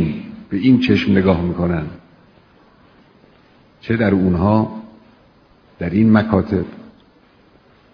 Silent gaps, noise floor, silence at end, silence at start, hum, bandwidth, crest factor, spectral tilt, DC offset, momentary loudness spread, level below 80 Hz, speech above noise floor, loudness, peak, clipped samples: none; -51 dBFS; 1.1 s; 0 s; none; 5.4 kHz; 18 dB; -9 dB/octave; under 0.1%; 16 LU; -42 dBFS; 36 dB; -17 LUFS; 0 dBFS; under 0.1%